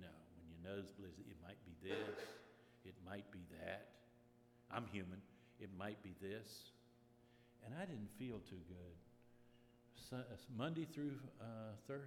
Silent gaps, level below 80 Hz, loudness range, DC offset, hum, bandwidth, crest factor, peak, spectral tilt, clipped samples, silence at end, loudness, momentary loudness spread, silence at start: none; -80 dBFS; 3 LU; under 0.1%; none; 18 kHz; 26 dB; -28 dBFS; -6 dB/octave; under 0.1%; 0 s; -53 LUFS; 16 LU; 0 s